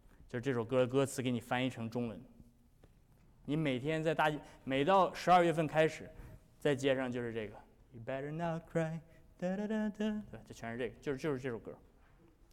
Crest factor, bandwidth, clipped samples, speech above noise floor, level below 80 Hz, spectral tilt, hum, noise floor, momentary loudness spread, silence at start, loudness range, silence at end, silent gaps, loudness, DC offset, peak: 18 dB; 16.5 kHz; under 0.1%; 29 dB; -64 dBFS; -6 dB/octave; none; -64 dBFS; 17 LU; 0.2 s; 7 LU; 0.75 s; none; -35 LUFS; under 0.1%; -18 dBFS